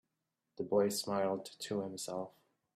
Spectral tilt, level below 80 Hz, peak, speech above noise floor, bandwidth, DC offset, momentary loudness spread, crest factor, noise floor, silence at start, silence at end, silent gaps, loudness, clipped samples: -4.5 dB/octave; -82 dBFS; -20 dBFS; 51 dB; 15.5 kHz; under 0.1%; 12 LU; 18 dB; -87 dBFS; 0.6 s; 0.45 s; none; -37 LUFS; under 0.1%